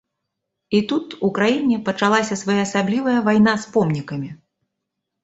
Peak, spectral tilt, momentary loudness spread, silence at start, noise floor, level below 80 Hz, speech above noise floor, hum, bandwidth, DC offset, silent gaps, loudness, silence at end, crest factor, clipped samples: -2 dBFS; -5.5 dB/octave; 8 LU; 0.7 s; -79 dBFS; -58 dBFS; 61 dB; none; 8 kHz; under 0.1%; none; -19 LUFS; 0.9 s; 18 dB; under 0.1%